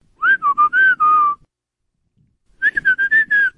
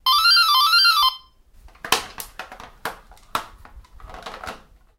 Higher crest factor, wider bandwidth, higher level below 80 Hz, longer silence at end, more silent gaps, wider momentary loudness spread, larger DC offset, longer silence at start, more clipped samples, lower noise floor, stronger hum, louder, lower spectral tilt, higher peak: second, 10 dB vs 22 dB; second, 5.6 kHz vs 17 kHz; second, -58 dBFS vs -48 dBFS; second, 0.05 s vs 0.45 s; neither; second, 7 LU vs 25 LU; neither; first, 0.2 s vs 0.05 s; neither; first, -76 dBFS vs -49 dBFS; neither; about the same, -14 LUFS vs -16 LUFS; first, -3 dB/octave vs 0.5 dB/octave; second, -6 dBFS vs -2 dBFS